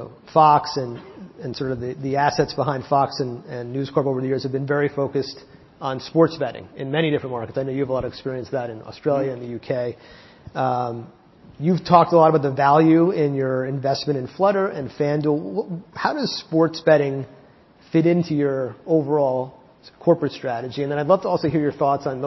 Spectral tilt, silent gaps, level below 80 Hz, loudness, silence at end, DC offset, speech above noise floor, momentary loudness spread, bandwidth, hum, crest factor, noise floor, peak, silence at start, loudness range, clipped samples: -7.5 dB/octave; none; -56 dBFS; -21 LUFS; 0 s; under 0.1%; 30 dB; 14 LU; 6.2 kHz; none; 20 dB; -51 dBFS; 0 dBFS; 0 s; 7 LU; under 0.1%